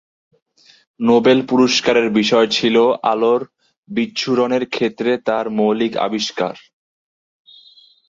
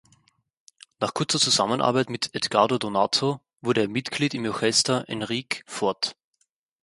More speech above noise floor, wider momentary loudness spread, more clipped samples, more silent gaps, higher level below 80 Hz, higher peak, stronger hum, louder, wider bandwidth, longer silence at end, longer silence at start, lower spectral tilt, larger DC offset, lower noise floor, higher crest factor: second, 32 dB vs 48 dB; about the same, 8 LU vs 9 LU; neither; first, 3.77-3.83 s vs none; first, -60 dBFS vs -66 dBFS; about the same, -2 dBFS vs -4 dBFS; neither; first, -16 LUFS vs -24 LUFS; second, 7.8 kHz vs 11.5 kHz; first, 1.5 s vs 0.7 s; about the same, 1 s vs 1 s; about the same, -4.5 dB/octave vs -3.5 dB/octave; neither; second, -49 dBFS vs -73 dBFS; second, 16 dB vs 22 dB